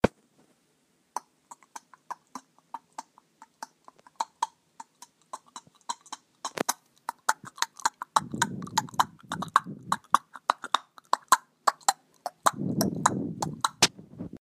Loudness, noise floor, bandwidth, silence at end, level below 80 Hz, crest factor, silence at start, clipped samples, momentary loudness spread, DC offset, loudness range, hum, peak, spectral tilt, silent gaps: -29 LUFS; -70 dBFS; 15.5 kHz; 0.05 s; -60 dBFS; 28 dB; 0.05 s; under 0.1%; 21 LU; under 0.1%; 17 LU; none; -4 dBFS; -2.5 dB/octave; none